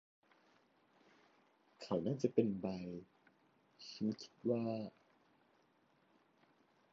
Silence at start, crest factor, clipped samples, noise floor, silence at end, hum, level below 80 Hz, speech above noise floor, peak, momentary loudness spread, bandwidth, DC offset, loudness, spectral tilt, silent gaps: 1.8 s; 26 dB; under 0.1%; -75 dBFS; 2.05 s; none; -78 dBFS; 35 dB; -18 dBFS; 17 LU; 7.2 kHz; under 0.1%; -40 LUFS; -7.5 dB/octave; none